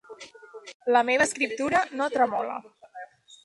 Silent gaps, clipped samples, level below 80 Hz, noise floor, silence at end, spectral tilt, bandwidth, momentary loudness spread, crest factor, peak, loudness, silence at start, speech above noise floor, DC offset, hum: 0.74-0.80 s; under 0.1%; -68 dBFS; -46 dBFS; 0.1 s; -2.5 dB/octave; 11.5 kHz; 22 LU; 18 dB; -8 dBFS; -25 LUFS; 0.1 s; 22 dB; under 0.1%; none